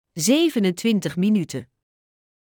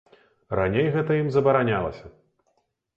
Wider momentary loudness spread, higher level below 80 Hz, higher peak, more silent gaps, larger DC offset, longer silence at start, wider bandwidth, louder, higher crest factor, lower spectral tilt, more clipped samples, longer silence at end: about the same, 9 LU vs 11 LU; second, -66 dBFS vs -50 dBFS; about the same, -6 dBFS vs -8 dBFS; neither; neither; second, 0.15 s vs 0.5 s; first, over 20 kHz vs 7.2 kHz; about the same, -21 LUFS vs -23 LUFS; about the same, 16 dB vs 18 dB; second, -5 dB/octave vs -9 dB/octave; neither; about the same, 0.85 s vs 0.85 s